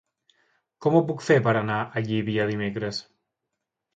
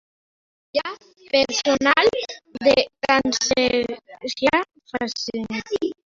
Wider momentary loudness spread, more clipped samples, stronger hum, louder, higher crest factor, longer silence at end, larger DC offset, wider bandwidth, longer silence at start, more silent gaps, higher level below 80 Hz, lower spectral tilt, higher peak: second, 9 LU vs 13 LU; neither; neither; second, -25 LUFS vs -21 LUFS; about the same, 20 dB vs 20 dB; first, 0.95 s vs 0.2 s; neither; first, 9 kHz vs 7.8 kHz; about the same, 0.8 s vs 0.75 s; neither; second, -62 dBFS vs -54 dBFS; first, -7 dB/octave vs -2.5 dB/octave; second, -6 dBFS vs -2 dBFS